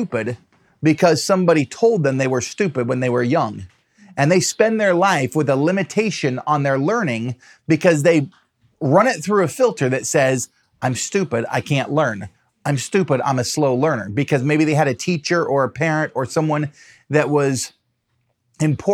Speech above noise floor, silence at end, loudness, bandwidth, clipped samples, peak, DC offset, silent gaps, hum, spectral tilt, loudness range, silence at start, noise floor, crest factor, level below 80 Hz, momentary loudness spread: 51 dB; 0 s; -18 LUFS; 15 kHz; under 0.1%; -2 dBFS; under 0.1%; none; none; -5.5 dB/octave; 3 LU; 0 s; -69 dBFS; 18 dB; -64 dBFS; 9 LU